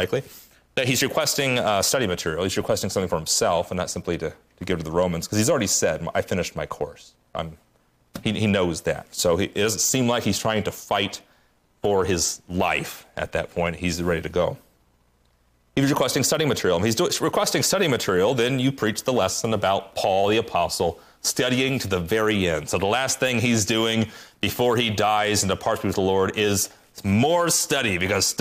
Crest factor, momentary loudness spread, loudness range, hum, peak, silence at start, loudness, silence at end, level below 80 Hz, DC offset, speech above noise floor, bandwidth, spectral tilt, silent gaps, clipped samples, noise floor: 14 dB; 9 LU; 4 LU; none; -10 dBFS; 0 s; -23 LUFS; 0.05 s; -52 dBFS; under 0.1%; 40 dB; 15.5 kHz; -3.5 dB/octave; none; under 0.1%; -63 dBFS